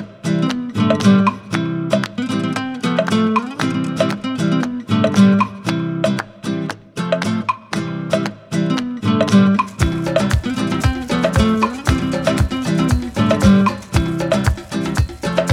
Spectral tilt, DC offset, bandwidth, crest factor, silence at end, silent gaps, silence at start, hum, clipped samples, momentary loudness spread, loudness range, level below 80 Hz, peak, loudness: -6.5 dB/octave; under 0.1%; 15 kHz; 16 dB; 0 s; none; 0 s; none; under 0.1%; 9 LU; 3 LU; -32 dBFS; 0 dBFS; -18 LUFS